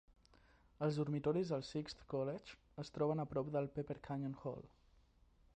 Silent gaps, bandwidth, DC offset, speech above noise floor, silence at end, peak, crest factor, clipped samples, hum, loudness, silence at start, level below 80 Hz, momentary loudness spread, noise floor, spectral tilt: none; 9.2 kHz; under 0.1%; 29 dB; 0.9 s; -26 dBFS; 16 dB; under 0.1%; none; -42 LUFS; 0.8 s; -68 dBFS; 12 LU; -70 dBFS; -7.5 dB/octave